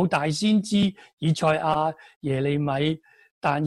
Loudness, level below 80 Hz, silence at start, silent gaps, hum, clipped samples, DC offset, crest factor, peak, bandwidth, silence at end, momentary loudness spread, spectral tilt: -24 LUFS; -58 dBFS; 0 s; 1.13-1.17 s, 2.16-2.21 s, 3.31-3.41 s; none; under 0.1%; under 0.1%; 16 dB; -8 dBFS; 12 kHz; 0 s; 7 LU; -6 dB/octave